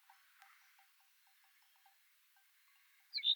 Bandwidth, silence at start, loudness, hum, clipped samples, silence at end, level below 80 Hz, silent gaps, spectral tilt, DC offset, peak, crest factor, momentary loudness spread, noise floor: over 20 kHz; 3.15 s; -40 LUFS; none; under 0.1%; 0 s; under -90 dBFS; none; 7 dB/octave; under 0.1%; -24 dBFS; 24 dB; 15 LU; -72 dBFS